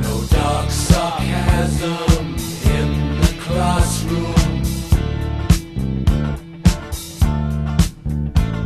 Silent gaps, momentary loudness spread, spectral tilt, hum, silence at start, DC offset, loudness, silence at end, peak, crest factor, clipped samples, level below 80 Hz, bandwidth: none; 5 LU; -5.5 dB/octave; none; 0 s; under 0.1%; -19 LUFS; 0 s; 0 dBFS; 16 dB; under 0.1%; -22 dBFS; 13.5 kHz